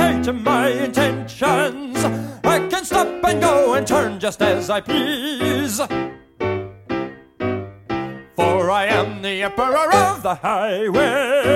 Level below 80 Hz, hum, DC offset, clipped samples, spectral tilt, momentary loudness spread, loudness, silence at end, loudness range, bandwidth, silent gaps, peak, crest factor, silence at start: -46 dBFS; none; under 0.1%; under 0.1%; -4.5 dB/octave; 11 LU; -19 LUFS; 0 s; 5 LU; 16.5 kHz; none; 0 dBFS; 18 dB; 0 s